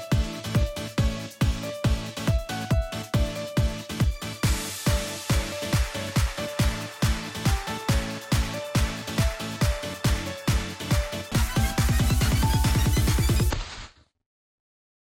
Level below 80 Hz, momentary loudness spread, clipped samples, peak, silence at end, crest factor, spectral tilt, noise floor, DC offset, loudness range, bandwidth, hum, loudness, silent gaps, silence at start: -30 dBFS; 5 LU; under 0.1%; -12 dBFS; 1.15 s; 14 dB; -5 dB/octave; -45 dBFS; under 0.1%; 3 LU; 17.5 kHz; none; -26 LUFS; none; 0 s